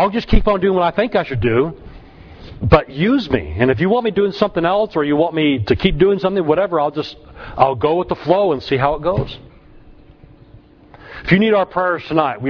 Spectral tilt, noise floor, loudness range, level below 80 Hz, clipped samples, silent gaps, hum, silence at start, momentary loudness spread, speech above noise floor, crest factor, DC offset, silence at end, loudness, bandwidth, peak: -8.5 dB/octave; -44 dBFS; 4 LU; -30 dBFS; under 0.1%; none; none; 0 s; 9 LU; 29 dB; 16 dB; under 0.1%; 0 s; -16 LUFS; 5.4 kHz; 0 dBFS